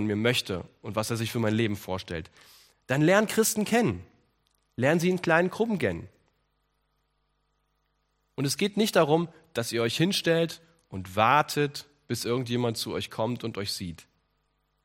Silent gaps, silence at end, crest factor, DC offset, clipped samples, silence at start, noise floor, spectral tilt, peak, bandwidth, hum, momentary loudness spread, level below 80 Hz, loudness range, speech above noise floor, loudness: none; 0.85 s; 22 dB; under 0.1%; under 0.1%; 0 s; -74 dBFS; -4.5 dB/octave; -6 dBFS; 16 kHz; 50 Hz at -55 dBFS; 13 LU; -66 dBFS; 6 LU; 47 dB; -27 LUFS